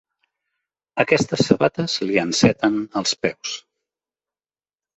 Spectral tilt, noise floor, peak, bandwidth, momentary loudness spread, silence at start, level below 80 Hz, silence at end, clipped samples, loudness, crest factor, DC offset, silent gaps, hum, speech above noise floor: -4.5 dB/octave; under -90 dBFS; -2 dBFS; 8.4 kHz; 12 LU; 0.95 s; -54 dBFS; 1.35 s; under 0.1%; -20 LUFS; 20 dB; under 0.1%; none; none; over 70 dB